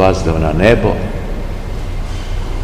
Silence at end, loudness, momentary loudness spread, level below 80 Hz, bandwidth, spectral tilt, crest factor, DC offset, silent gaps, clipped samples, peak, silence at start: 0 s; -16 LUFS; 14 LU; -20 dBFS; 12 kHz; -6.5 dB/octave; 14 dB; 0.9%; none; 0.4%; 0 dBFS; 0 s